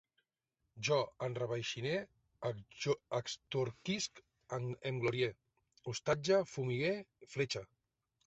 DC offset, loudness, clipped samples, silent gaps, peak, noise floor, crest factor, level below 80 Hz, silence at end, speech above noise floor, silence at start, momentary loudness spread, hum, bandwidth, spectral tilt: under 0.1%; -38 LUFS; under 0.1%; none; -20 dBFS; -87 dBFS; 20 dB; -72 dBFS; 0.65 s; 49 dB; 0.75 s; 10 LU; none; 8 kHz; -4 dB/octave